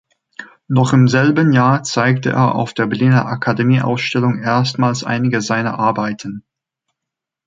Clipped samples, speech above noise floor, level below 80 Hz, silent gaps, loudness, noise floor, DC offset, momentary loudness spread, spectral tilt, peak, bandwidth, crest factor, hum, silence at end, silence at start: under 0.1%; 68 dB; -56 dBFS; none; -15 LUFS; -83 dBFS; under 0.1%; 10 LU; -6.5 dB/octave; -2 dBFS; 7.8 kHz; 14 dB; none; 1.05 s; 0.4 s